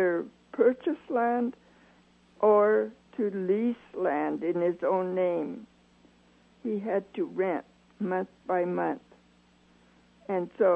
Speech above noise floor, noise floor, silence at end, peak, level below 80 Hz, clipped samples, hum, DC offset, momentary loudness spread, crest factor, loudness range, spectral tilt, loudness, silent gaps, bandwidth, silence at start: 34 dB; -62 dBFS; 0 s; -12 dBFS; -72 dBFS; under 0.1%; none; under 0.1%; 11 LU; 18 dB; 6 LU; -9 dB/octave; -29 LUFS; none; 5.4 kHz; 0 s